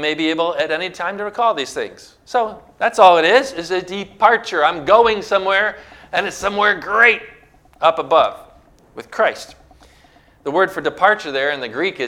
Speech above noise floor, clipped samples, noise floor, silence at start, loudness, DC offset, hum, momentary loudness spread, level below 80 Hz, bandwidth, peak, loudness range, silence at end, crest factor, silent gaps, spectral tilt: 33 dB; under 0.1%; -50 dBFS; 0 s; -17 LUFS; under 0.1%; none; 11 LU; -54 dBFS; 15.5 kHz; 0 dBFS; 6 LU; 0 s; 18 dB; none; -3.5 dB/octave